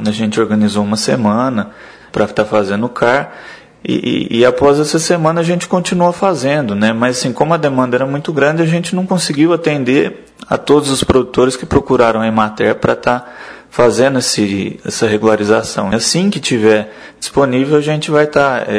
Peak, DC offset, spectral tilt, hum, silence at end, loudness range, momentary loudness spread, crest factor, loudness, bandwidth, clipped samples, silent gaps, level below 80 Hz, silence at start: 0 dBFS; under 0.1%; -5 dB/octave; none; 0 s; 2 LU; 7 LU; 14 dB; -13 LUFS; 11 kHz; 0.1%; none; -42 dBFS; 0 s